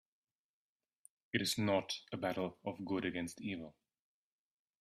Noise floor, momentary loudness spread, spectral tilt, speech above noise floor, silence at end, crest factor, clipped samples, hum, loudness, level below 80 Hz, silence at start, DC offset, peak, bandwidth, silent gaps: under -90 dBFS; 10 LU; -4.5 dB/octave; over 51 dB; 1.1 s; 24 dB; under 0.1%; none; -39 LUFS; -76 dBFS; 1.35 s; under 0.1%; -18 dBFS; 15 kHz; none